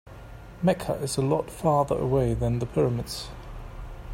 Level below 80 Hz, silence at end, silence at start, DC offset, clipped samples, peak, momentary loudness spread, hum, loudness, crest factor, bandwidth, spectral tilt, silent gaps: -42 dBFS; 0 s; 0.05 s; under 0.1%; under 0.1%; -8 dBFS; 18 LU; none; -26 LUFS; 18 dB; 16.5 kHz; -6.5 dB/octave; none